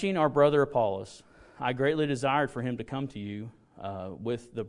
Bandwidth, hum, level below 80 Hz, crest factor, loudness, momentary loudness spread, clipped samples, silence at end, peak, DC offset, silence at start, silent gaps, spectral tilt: 11 kHz; none; -62 dBFS; 20 dB; -29 LUFS; 16 LU; under 0.1%; 0 s; -10 dBFS; under 0.1%; 0 s; none; -6.5 dB/octave